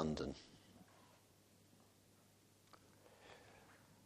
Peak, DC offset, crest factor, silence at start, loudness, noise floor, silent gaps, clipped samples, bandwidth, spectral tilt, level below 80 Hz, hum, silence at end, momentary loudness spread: -26 dBFS; under 0.1%; 28 dB; 0 s; -53 LUFS; -71 dBFS; none; under 0.1%; 15 kHz; -6 dB/octave; -68 dBFS; none; 0.1 s; 21 LU